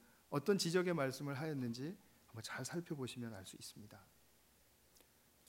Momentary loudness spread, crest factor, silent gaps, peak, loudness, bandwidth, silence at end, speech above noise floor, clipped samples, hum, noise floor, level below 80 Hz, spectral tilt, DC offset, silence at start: 21 LU; 20 dB; none; -22 dBFS; -42 LUFS; 16 kHz; 1.45 s; 29 dB; under 0.1%; none; -71 dBFS; -82 dBFS; -5 dB/octave; under 0.1%; 0.3 s